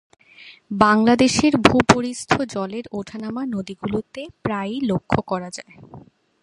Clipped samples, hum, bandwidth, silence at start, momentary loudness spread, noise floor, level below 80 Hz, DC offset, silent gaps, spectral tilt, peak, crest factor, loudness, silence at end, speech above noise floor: under 0.1%; none; 11.5 kHz; 0.4 s; 15 LU; -47 dBFS; -46 dBFS; under 0.1%; none; -5 dB/octave; 0 dBFS; 20 dB; -20 LUFS; 0.45 s; 26 dB